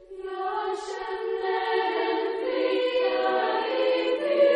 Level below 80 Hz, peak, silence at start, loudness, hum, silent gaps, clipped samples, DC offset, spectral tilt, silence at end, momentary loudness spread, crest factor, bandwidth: -66 dBFS; -10 dBFS; 0 s; -26 LUFS; none; none; under 0.1%; under 0.1%; -3 dB/octave; 0 s; 7 LU; 14 dB; 10 kHz